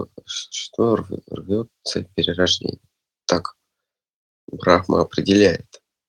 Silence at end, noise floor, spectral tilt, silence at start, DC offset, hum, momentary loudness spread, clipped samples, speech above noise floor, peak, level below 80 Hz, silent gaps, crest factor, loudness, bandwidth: 0.45 s; -83 dBFS; -4.5 dB/octave; 0 s; under 0.1%; none; 15 LU; under 0.1%; 63 dB; 0 dBFS; -52 dBFS; 4.10-4.48 s; 22 dB; -21 LUFS; 10.5 kHz